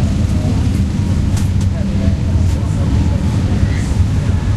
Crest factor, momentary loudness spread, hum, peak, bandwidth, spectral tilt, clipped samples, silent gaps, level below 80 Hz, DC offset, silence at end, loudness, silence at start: 12 dB; 1 LU; none; -2 dBFS; 12 kHz; -7.5 dB/octave; under 0.1%; none; -20 dBFS; 0.7%; 0 s; -16 LUFS; 0 s